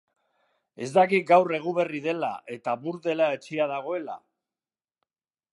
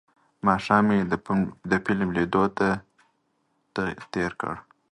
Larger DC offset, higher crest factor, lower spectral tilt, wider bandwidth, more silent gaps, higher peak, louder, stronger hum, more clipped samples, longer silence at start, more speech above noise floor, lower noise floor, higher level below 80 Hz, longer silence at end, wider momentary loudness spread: neither; about the same, 20 dB vs 22 dB; about the same, -6 dB/octave vs -7 dB/octave; first, 11.5 kHz vs 9.6 kHz; neither; about the same, -6 dBFS vs -4 dBFS; about the same, -25 LUFS vs -25 LUFS; neither; neither; first, 0.8 s vs 0.45 s; first, over 65 dB vs 47 dB; first, under -90 dBFS vs -71 dBFS; second, -82 dBFS vs -52 dBFS; first, 1.35 s vs 0.3 s; about the same, 13 LU vs 12 LU